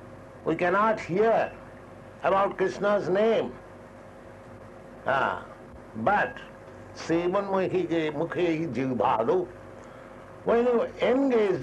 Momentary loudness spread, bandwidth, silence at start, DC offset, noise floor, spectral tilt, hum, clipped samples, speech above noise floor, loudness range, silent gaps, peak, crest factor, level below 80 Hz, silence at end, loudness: 23 LU; 11 kHz; 0 s; under 0.1%; -46 dBFS; -6.5 dB/octave; none; under 0.1%; 21 dB; 4 LU; none; -10 dBFS; 16 dB; -58 dBFS; 0 s; -26 LUFS